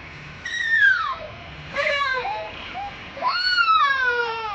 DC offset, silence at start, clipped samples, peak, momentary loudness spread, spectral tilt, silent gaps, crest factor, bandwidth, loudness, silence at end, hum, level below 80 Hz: under 0.1%; 0 s; under 0.1%; -8 dBFS; 17 LU; -2 dB/octave; none; 16 dB; 8.4 kHz; -20 LUFS; 0 s; none; -52 dBFS